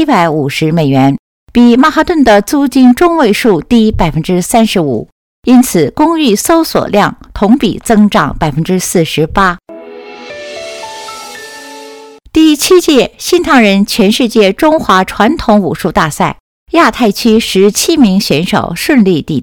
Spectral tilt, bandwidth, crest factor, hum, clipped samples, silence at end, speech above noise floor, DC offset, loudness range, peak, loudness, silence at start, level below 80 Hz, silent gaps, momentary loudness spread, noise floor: -5 dB/octave; 19 kHz; 10 dB; none; 0.9%; 0 s; 24 dB; 0.2%; 6 LU; 0 dBFS; -9 LUFS; 0 s; -32 dBFS; 1.19-1.47 s, 5.12-5.43 s, 16.40-16.66 s; 17 LU; -32 dBFS